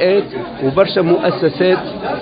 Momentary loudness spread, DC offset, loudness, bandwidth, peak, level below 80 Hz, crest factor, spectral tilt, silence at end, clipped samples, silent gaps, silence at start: 7 LU; under 0.1%; -15 LUFS; 5 kHz; 0 dBFS; -48 dBFS; 14 dB; -10 dB/octave; 0 s; under 0.1%; none; 0 s